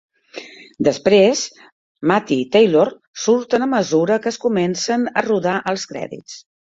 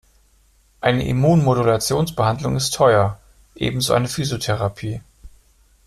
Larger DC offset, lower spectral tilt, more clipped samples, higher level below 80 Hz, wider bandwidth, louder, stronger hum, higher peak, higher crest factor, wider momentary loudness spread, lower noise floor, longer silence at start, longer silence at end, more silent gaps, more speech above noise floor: neither; about the same, -4.5 dB/octave vs -5.5 dB/octave; neither; second, -60 dBFS vs -44 dBFS; second, 7.8 kHz vs 15 kHz; about the same, -18 LUFS vs -19 LUFS; neither; about the same, -2 dBFS vs -2 dBFS; about the same, 16 dB vs 18 dB; first, 21 LU vs 10 LU; second, -38 dBFS vs -57 dBFS; second, 0.35 s vs 0.8 s; second, 0.35 s vs 0.6 s; first, 1.72-1.95 s, 3.07-3.13 s vs none; second, 20 dB vs 38 dB